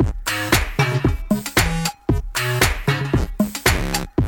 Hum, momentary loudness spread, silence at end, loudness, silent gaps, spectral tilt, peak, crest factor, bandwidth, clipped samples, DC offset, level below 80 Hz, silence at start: none; 5 LU; 0 s; -20 LUFS; none; -4.5 dB/octave; 0 dBFS; 20 dB; 19 kHz; under 0.1%; under 0.1%; -28 dBFS; 0 s